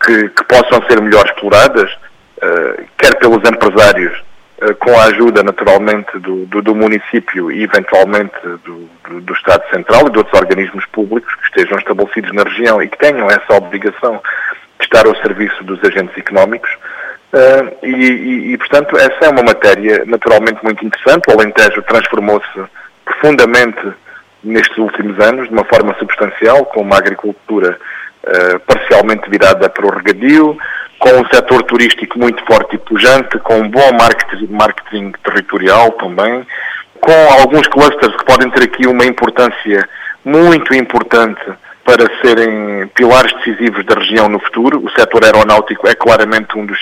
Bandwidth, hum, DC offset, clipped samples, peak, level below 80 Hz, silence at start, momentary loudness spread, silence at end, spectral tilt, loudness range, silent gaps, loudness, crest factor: 16.5 kHz; none; under 0.1%; 0.5%; 0 dBFS; -40 dBFS; 0 s; 11 LU; 0 s; -4.5 dB/octave; 3 LU; none; -9 LUFS; 10 dB